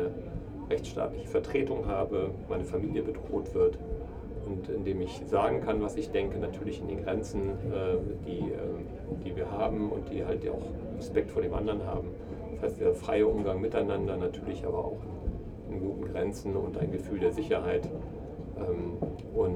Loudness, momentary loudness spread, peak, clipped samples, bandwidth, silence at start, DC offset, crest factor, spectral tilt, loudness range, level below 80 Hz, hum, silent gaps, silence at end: -33 LUFS; 10 LU; -14 dBFS; under 0.1%; 10.5 kHz; 0 s; under 0.1%; 18 dB; -7.5 dB/octave; 3 LU; -44 dBFS; none; none; 0 s